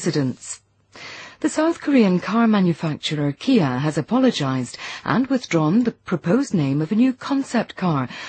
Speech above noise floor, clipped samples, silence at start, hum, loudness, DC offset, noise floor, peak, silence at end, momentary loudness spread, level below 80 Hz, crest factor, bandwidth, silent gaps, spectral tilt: 21 dB; under 0.1%; 0 s; none; -20 LUFS; under 0.1%; -41 dBFS; -4 dBFS; 0 s; 11 LU; -60 dBFS; 16 dB; 8.8 kHz; none; -6 dB/octave